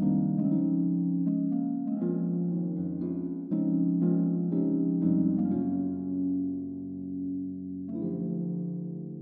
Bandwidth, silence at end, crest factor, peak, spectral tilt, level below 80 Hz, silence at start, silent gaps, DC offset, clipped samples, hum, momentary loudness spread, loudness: 1.6 kHz; 0 s; 14 dB; -14 dBFS; -15 dB/octave; -70 dBFS; 0 s; none; under 0.1%; under 0.1%; none; 9 LU; -30 LUFS